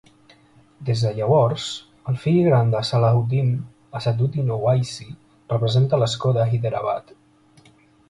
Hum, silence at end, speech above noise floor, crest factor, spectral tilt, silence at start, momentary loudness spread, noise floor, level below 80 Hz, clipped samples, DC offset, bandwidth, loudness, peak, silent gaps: none; 1.1 s; 34 dB; 16 dB; -7 dB/octave; 0.8 s; 12 LU; -54 dBFS; -54 dBFS; under 0.1%; under 0.1%; 11 kHz; -21 LUFS; -6 dBFS; none